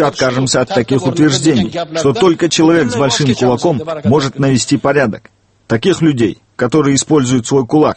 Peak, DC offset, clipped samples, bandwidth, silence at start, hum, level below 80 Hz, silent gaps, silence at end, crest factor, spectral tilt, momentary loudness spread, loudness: 0 dBFS; under 0.1%; under 0.1%; 8.8 kHz; 0 s; none; -44 dBFS; none; 0 s; 12 dB; -5 dB/octave; 5 LU; -13 LUFS